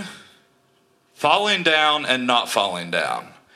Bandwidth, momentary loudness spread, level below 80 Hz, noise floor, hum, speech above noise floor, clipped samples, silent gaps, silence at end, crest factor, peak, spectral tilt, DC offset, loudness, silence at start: 15.5 kHz; 9 LU; -70 dBFS; -61 dBFS; none; 41 dB; under 0.1%; none; 0.25 s; 20 dB; -2 dBFS; -2.5 dB/octave; under 0.1%; -19 LUFS; 0 s